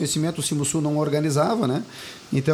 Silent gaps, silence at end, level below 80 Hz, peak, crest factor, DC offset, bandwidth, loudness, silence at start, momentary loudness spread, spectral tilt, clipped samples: none; 0 s; -58 dBFS; -8 dBFS; 16 dB; under 0.1%; 18 kHz; -23 LUFS; 0 s; 7 LU; -5 dB/octave; under 0.1%